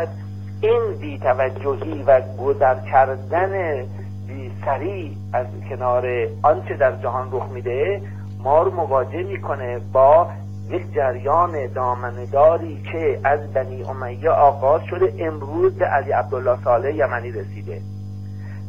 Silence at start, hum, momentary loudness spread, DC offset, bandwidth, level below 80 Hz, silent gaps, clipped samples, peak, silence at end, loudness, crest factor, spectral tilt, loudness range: 0 s; 50 Hz at -30 dBFS; 14 LU; 0.7%; 7 kHz; -52 dBFS; none; under 0.1%; -2 dBFS; 0 s; -20 LUFS; 18 dB; -9 dB/octave; 3 LU